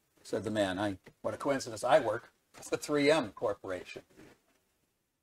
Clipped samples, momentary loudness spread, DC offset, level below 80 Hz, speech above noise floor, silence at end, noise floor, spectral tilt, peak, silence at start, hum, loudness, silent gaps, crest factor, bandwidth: under 0.1%; 13 LU; under 0.1%; -68 dBFS; 46 dB; 1 s; -79 dBFS; -4.5 dB/octave; -14 dBFS; 0.25 s; none; -33 LUFS; none; 20 dB; 15.5 kHz